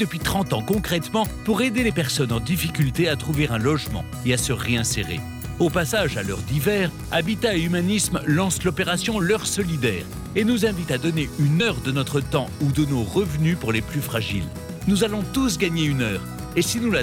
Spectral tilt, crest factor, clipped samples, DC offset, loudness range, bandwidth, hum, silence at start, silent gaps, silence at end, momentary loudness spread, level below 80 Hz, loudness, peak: -5 dB/octave; 14 dB; under 0.1%; under 0.1%; 1 LU; 19.5 kHz; none; 0 s; none; 0 s; 5 LU; -40 dBFS; -23 LUFS; -8 dBFS